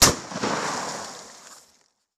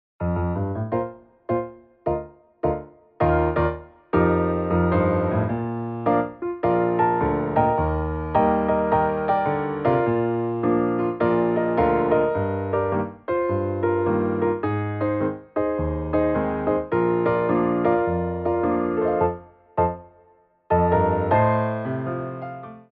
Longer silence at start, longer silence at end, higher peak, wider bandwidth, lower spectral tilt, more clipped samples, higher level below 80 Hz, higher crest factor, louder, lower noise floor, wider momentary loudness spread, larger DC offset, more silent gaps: second, 0 s vs 0.2 s; first, 0.6 s vs 0.1 s; first, -2 dBFS vs -6 dBFS; first, 14.5 kHz vs 4.5 kHz; second, -1.5 dB/octave vs -8 dB/octave; neither; second, -46 dBFS vs -40 dBFS; first, 24 dB vs 16 dB; second, -26 LUFS vs -23 LUFS; first, -63 dBFS vs -58 dBFS; first, 20 LU vs 8 LU; neither; neither